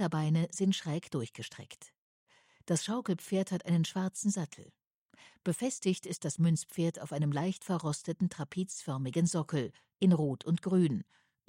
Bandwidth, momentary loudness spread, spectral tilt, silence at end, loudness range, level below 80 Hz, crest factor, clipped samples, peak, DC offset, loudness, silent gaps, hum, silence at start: 16 kHz; 11 LU; -6 dB/octave; 0.45 s; 3 LU; -74 dBFS; 16 dB; under 0.1%; -18 dBFS; under 0.1%; -33 LUFS; 1.98-2.27 s, 4.87-5.09 s; none; 0 s